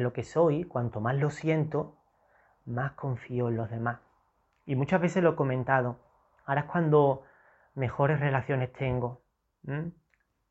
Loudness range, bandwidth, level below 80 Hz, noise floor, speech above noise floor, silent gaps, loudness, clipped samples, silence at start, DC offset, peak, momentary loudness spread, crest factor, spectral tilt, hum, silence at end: 5 LU; 8.2 kHz; -60 dBFS; -71 dBFS; 43 dB; none; -29 LUFS; under 0.1%; 0 s; under 0.1%; -10 dBFS; 13 LU; 20 dB; -8.5 dB/octave; none; 0.6 s